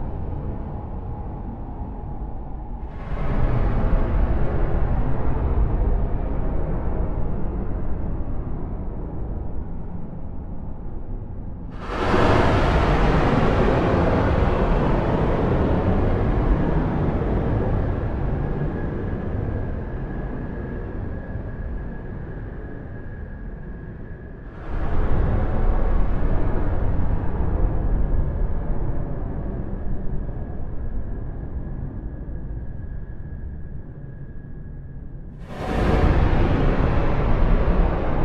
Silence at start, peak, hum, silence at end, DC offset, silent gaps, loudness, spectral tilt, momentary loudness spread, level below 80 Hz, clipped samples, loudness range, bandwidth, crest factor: 0 s; -4 dBFS; none; 0 s; under 0.1%; none; -25 LUFS; -8.5 dB/octave; 16 LU; -24 dBFS; under 0.1%; 13 LU; 6.4 kHz; 18 dB